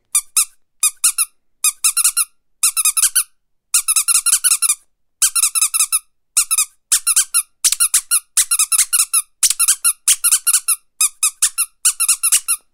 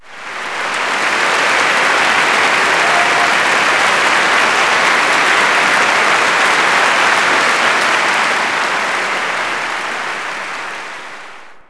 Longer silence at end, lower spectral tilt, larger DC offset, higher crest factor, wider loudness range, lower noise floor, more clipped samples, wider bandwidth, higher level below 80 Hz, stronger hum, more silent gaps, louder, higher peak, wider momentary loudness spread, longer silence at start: about the same, 0.15 s vs 0.1 s; second, 7 dB/octave vs -1 dB/octave; neither; about the same, 18 dB vs 14 dB; second, 2 LU vs 5 LU; first, -55 dBFS vs -35 dBFS; neither; first, over 20 kHz vs 11 kHz; about the same, -62 dBFS vs -58 dBFS; neither; neither; about the same, -14 LUFS vs -12 LUFS; about the same, 0 dBFS vs 0 dBFS; second, 6 LU vs 11 LU; about the same, 0.15 s vs 0.05 s